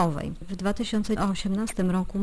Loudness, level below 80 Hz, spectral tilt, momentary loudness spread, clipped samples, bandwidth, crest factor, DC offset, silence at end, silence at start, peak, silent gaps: -28 LUFS; -40 dBFS; -6 dB/octave; 5 LU; under 0.1%; 11 kHz; 14 dB; under 0.1%; 0 s; 0 s; -12 dBFS; none